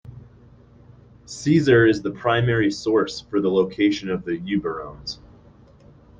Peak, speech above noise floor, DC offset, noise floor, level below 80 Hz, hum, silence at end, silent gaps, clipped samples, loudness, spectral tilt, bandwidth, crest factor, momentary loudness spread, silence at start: -4 dBFS; 29 dB; under 0.1%; -50 dBFS; -50 dBFS; 60 Hz at -40 dBFS; 1.05 s; none; under 0.1%; -21 LUFS; -6.5 dB/octave; 9.4 kHz; 18 dB; 16 LU; 0.05 s